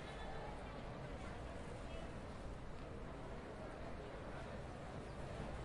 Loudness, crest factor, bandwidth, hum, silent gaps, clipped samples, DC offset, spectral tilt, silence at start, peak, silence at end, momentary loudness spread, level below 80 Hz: -51 LUFS; 14 dB; 11 kHz; none; none; under 0.1%; under 0.1%; -6 dB/octave; 0 s; -36 dBFS; 0 s; 2 LU; -54 dBFS